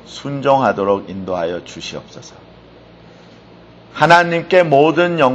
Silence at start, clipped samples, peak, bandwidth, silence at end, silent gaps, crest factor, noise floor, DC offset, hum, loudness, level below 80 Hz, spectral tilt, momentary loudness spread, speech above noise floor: 0.1 s; under 0.1%; 0 dBFS; 8.8 kHz; 0 s; none; 16 dB; -42 dBFS; under 0.1%; none; -14 LUFS; -54 dBFS; -5.5 dB/octave; 18 LU; 27 dB